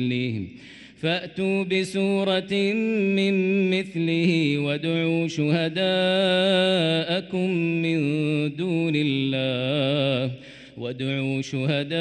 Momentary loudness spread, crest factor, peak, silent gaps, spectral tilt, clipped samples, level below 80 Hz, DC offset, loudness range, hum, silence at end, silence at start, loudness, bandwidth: 7 LU; 14 dB; -10 dBFS; none; -6.5 dB/octave; under 0.1%; -64 dBFS; under 0.1%; 3 LU; none; 0 s; 0 s; -23 LUFS; 11.5 kHz